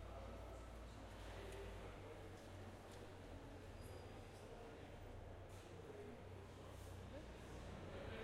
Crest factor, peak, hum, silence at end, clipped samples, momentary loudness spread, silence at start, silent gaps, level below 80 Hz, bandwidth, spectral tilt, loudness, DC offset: 16 dB; -38 dBFS; none; 0 s; under 0.1%; 3 LU; 0 s; none; -62 dBFS; 15.5 kHz; -5.5 dB/octave; -57 LUFS; under 0.1%